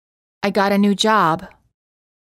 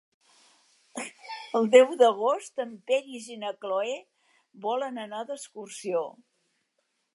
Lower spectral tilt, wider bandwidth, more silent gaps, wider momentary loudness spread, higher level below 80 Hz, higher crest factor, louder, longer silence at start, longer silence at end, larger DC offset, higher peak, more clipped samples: first, -5 dB/octave vs -3.5 dB/octave; first, 15 kHz vs 11.5 kHz; neither; second, 9 LU vs 19 LU; first, -58 dBFS vs -90 dBFS; second, 16 dB vs 24 dB; first, -17 LUFS vs -26 LUFS; second, 0.45 s vs 0.95 s; second, 0.9 s vs 1.05 s; neither; about the same, -4 dBFS vs -4 dBFS; neither